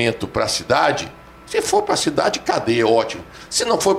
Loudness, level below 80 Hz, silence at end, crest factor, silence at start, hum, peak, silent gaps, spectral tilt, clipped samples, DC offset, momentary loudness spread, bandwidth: -19 LUFS; -48 dBFS; 0 s; 16 dB; 0 s; none; -4 dBFS; none; -3.5 dB/octave; under 0.1%; under 0.1%; 9 LU; 16 kHz